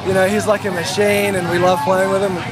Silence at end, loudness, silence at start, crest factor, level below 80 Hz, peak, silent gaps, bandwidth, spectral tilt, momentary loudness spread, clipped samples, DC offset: 0 s; -16 LUFS; 0 s; 14 dB; -48 dBFS; -4 dBFS; none; 15.5 kHz; -4.5 dB/octave; 3 LU; under 0.1%; under 0.1%